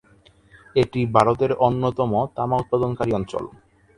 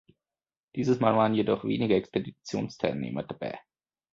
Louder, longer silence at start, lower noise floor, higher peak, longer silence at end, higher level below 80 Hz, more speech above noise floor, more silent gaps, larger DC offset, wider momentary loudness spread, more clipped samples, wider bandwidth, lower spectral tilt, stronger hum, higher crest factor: first, -22 LUFS vs -28 LUFS; about the same, 0.75 s vs 0.75 s; second, -55 dBFS vs under -90 dBFS; first, 0 dBFS vs -10 dBFS; about the same, 0.5 s vs 0.55 s; first, -48 dBFS vs -62 dBFS; second, 34 dB vs over 62 dB; neither; neither; second, 7 LU vs 13 LU; neither; first, 11 kHz vs 7.8 kHz; about the same, -8 dB/octave vs -7 dB/octave; neither; about the same, 22 dB vs 20 dB